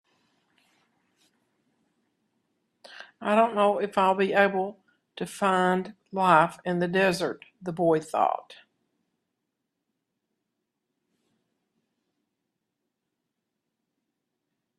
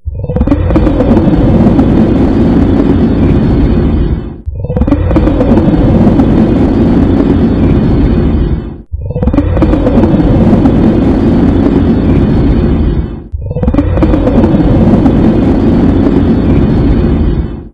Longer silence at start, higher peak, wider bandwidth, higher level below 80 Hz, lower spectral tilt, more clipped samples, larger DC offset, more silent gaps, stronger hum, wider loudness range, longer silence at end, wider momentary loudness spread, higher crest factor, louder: first, 2.9 s vs 0.05 s; second, -6 dBFS vs 0 dBFS; first, 13.5 kHz vs 6 kHz; second, -72 dBFS vs -14 dBFS; second, -5.5 dB/octave vs -10 dB/octave; second, under 0.1% vs 2%; neither; neither; neither; first, 7 LU vs 2 LU; first, 6.25 s vs 0.05 s; first, 15 LU vs 7 LU; first, 24 dB vs 8 dB; second, -25 LUFS vs -9 LUFS